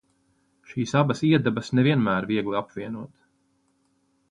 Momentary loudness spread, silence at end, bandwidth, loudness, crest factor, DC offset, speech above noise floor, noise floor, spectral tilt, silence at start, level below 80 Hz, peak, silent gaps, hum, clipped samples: 15 LU; 1.25 s; 10.5 kHz; -24 LUFS; 20 dB; under 0.1%; 45 dB; -68 dBFS; -7 dB/octave; 0.7 s; -60 dBFS; -6 dBFS; none; none; under 0.1%